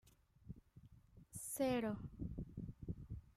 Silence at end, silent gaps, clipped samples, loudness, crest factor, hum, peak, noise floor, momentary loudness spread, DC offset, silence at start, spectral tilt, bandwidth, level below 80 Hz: 0.05 s; none; under 0.1%; -45 LUFS; 20 dB; none; -28 dBFS; -65 dBFS; 26 LU; under 0.1%; 0.05 s; -5.5 dB/octave; 16 kHz; -60 dBFS